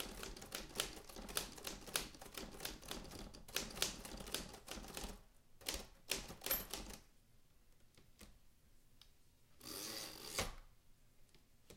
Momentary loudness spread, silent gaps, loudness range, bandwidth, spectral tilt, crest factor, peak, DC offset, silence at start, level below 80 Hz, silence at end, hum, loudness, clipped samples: 14 LU; none; 5 LU; 17 kHz; -1.5 dB/octave; 32 dB; -18 dBFS; under 0.1%; 0 s; -60 dBFS; 0 s; none; -46 LUFS; under 0.1%